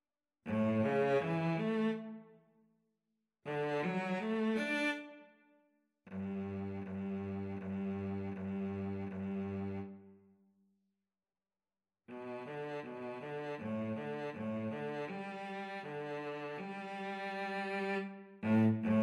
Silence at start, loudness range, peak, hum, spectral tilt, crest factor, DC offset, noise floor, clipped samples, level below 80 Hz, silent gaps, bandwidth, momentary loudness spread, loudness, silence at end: 0.45 s; 9 LU; -22 dBFS; none; -7.5 dB/octave; 18 dB; under 0.1%; under -90 dBFS; under 0.1%; -82 dBFS; none; 11 kHz; 12 LU; -38 LUFS; 0 s